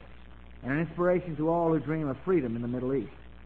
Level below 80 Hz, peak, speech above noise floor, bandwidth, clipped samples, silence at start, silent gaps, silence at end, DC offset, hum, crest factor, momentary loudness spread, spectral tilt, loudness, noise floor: -52 dBFS; -14 dBFS; 21 dB; 4.3 kHz; under 0.1%; 0 s; none; 0 s; 0.3%; none; 14 dB; 6 LU; -10.5 dB/octave; -29 LUFS; -50 dBFS